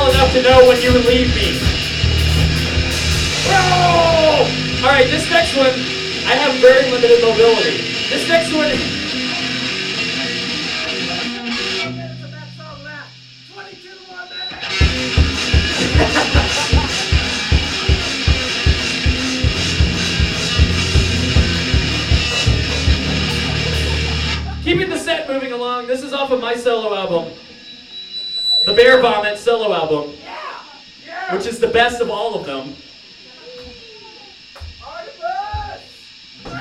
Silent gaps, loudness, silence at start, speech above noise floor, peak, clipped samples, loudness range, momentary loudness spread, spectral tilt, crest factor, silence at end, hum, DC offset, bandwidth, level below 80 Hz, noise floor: none; -15 LUFS; 0 s; 27 dB; 0 dBFS; under 0.1%; 10 LU; 20 LU; -4.5 dB/octave; 16 dB; 0 s; none; under 0.1%; 15.5 kHz; -26 dBFS; -40 dBFS